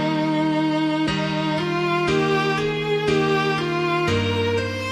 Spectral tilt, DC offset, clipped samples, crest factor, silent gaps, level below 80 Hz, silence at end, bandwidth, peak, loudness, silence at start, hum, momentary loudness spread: -6 dB/octave; under 0.1%; under 0.1%; 14 dB; none; -48 dBFS; 0 s; 12.5 kHz; -8 dBFS; -21 LUFS; 0 s; none; 3 LU